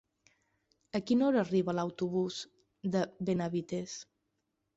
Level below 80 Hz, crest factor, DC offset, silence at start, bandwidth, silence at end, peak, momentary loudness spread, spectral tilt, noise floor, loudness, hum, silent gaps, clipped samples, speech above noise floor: -72 dBFS; 16 dB; under 0.1%; 0.95 s; 8 kHz; 0.75 s; -18 dBFS; 14 LU; -6.5 dB/octave; -82 dBFS; -33 LUFS; none; none; under 0.1%; 50 dB